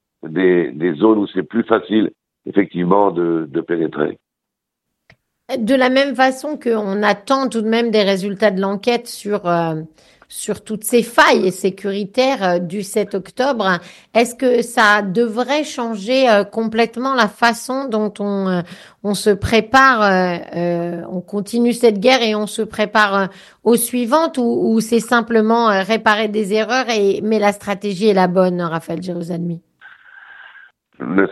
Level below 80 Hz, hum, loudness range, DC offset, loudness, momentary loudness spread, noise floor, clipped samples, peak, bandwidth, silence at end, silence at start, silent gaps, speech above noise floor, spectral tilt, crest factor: -52 dBFS; none; 4 LU; under 0.1%; -17 LUFS; 10 LU; -80 dBFS; under 0.1%; 0 dBFS; 12.5 kHz; 0 s; 0.25 s; none; 64 dB; -5 dB/octave; 16 dB